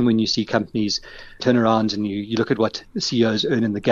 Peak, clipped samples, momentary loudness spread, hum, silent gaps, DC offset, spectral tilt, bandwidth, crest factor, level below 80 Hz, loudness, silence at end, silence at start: -4 dBFS; under 0.1%; 7 LU; none; none; under 0.1%; -5 dB/octave; 7.4 kHz; 16 dB; -50 dBFS; -21 LUFS; 0 s; 0 s